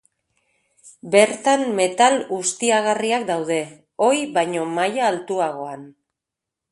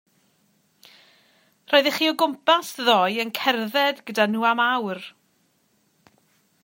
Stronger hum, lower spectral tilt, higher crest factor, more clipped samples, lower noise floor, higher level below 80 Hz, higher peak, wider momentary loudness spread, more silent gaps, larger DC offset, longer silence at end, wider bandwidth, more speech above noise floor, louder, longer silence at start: neither; about the same, -3 dB/octave vs -3.5 dB/octave; about the same, 20 dB vs 24 dB; neither; first, -85 dBFS vs -66 dBFS; first, -70 dBFS vs -82 dBFS; about the same, 0 dBFS vs 0 dBFS; first, 9 LU vs 5 LU; neither; neither; second, 0.8 s vs 1.55 s; second, 11.5 kHz vs 16.5 kHz; first, 65 dB vs 44 dB; about the same, -20 LUFS vs -21 LUFS; second, 0.85 s vs 1.7 s